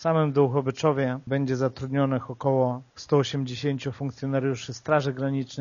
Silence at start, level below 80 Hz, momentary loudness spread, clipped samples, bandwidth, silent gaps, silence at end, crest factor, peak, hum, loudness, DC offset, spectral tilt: 0 s; -62 dBFS; 6 LU; under 0.1%; 7.2 kHz; none; 0 s; 18 dB; -8 dBFS; none; -26 LUFS; under 0.1%; -6.5 dB/octave